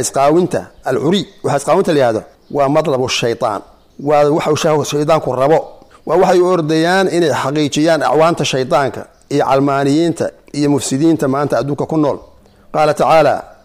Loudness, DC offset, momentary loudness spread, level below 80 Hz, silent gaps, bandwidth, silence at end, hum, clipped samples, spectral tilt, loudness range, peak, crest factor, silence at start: -14 LUFS; under 0.1%; 8 LU; -48 dBFS; none; 15.5 kHz; 0.15 s; none; under 0.1%; -5 dB/octave; 2 LU; -2 dBFS; 12 dB; 0 s